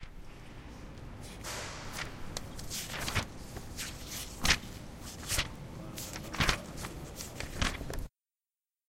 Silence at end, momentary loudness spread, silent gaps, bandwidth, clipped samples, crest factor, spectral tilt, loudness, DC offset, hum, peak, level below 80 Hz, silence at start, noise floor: 0.8 s; 17 LU; none; 16 kHz; under 0.1%; 30 dB; -2.5 dB/octave; -36 LUFS; under 0.1%; none; -8 dBFS; -44 dBFS; 0 s; under -90 dBFS